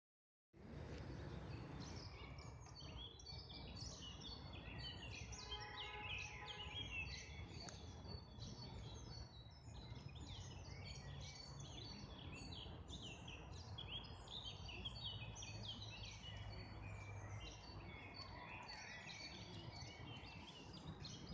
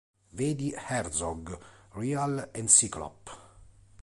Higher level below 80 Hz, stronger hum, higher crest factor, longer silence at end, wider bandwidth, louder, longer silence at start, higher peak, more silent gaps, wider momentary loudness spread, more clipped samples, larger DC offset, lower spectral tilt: second, -62 dBFS vs -54 dBFS; neither; second, 18 dB vs 24 dB; second, 0 s vs 0.35 s; second, 9.6 kHz vs 11.5 kHz; second, -53 LUFS vs -27 LUFS; first, 0.55 s vs 0.35 s; second, -36 dBFS vs -6 dBFS; neither; second, 7 LU vs 26 LU; neither; neither; about the same, -4 dB/octave vs -3.5 dB/octave